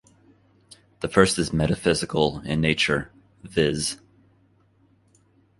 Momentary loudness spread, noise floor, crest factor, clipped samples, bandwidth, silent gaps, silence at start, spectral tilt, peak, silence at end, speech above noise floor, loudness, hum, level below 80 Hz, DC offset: 10 LU; -61 dBFS; 24 dB; under 0.1%; 11.5 kHz; none; 1 s; -4.5 dB/octave; -2 dBFS; 1.65 s; 38 dB; -23 LUFS; none; -46 dBFS; under 0.1%